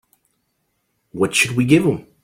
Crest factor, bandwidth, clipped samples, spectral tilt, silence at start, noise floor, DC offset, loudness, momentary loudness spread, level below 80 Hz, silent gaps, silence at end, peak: 18 dB; 16.5 kHz; under 0.1%; -4.5 dB/octave; 1.15 s; -70 dBFS; under 0.1%; -17 LUFS; 8 LU; -54 dBFS; none; 0.2 s; -2 dBFS